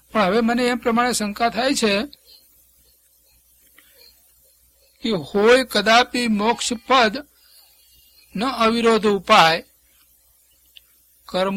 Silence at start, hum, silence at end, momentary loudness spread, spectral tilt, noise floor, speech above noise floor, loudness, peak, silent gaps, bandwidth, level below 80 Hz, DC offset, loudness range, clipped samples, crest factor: 0.15 s; none; 0 s; 10 LU; -3.5 dB/octave; -58 dBFS; 40 dB; -18 LUFS; 0 dBFS; none; 16.5 kHz; -54 dBFS; under 0.1%; 8 LU; under 0.1%; 22 dB